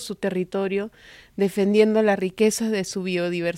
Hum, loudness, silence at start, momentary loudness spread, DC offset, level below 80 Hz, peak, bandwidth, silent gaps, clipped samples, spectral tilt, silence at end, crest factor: none; -22 LUFS; 0 s; 9 LU; under 0.1%; -62 dBFS; -6 dBFS; 16 kHz; none; under 0.1%; -5 dB/octave; 0 s; 18 dB